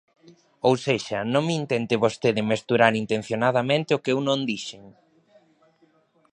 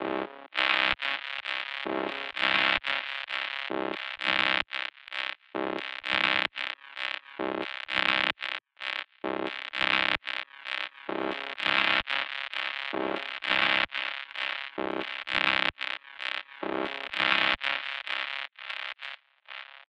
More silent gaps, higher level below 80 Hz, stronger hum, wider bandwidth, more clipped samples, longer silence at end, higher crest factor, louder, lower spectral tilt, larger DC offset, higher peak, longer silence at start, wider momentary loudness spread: neither; about the same, -66 dBFS vs -64 dBFS; neither; about the same, 10.5 kHz vs 11 kHz; neither; first, 1.45 s vs 0.1 s; about the same, 24 dB vs 24 dB; first, -23 LUFS vs -29 LUFS; first, -5.5 dB/octave vs -3.5 dB/octave; neither; first, -2 dBFS vs -6 dBFS; first, 0.65 s vs 0 s; second, 6 LU vs 11 LU